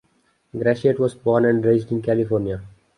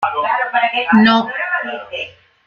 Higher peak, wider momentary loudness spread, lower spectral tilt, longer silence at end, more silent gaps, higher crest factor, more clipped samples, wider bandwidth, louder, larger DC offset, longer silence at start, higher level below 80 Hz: about the same, -4 dBFS vs -2 dBFS; second, 10 LU vs 15 LU; first, -8.5 dB/octave vs -6.5 dB/octave; about the same, 0.3 s vs 0.35 s; neither; about the same, 16 dB vs 16 dB; neither; first, 11 kHz vs 6.6 kHz; second, -20 LUFS vs -15 LUFS; neither; first, 0.55 s vs 0 s; first, -52 dBFS vs -58 dBFS